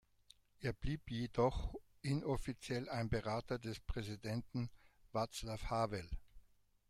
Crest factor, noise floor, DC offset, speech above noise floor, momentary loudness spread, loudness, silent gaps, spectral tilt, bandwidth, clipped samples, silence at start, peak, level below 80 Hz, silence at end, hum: 20 dB; -69 dBFS; under 0.1%; 29 dB; 9 LU; -42 LUFS; none; -6 dB/octave; 14.5 kHz; under 0.1%; 0.6 s; -22 dBFS; -52 dBFS; 0.5 s; none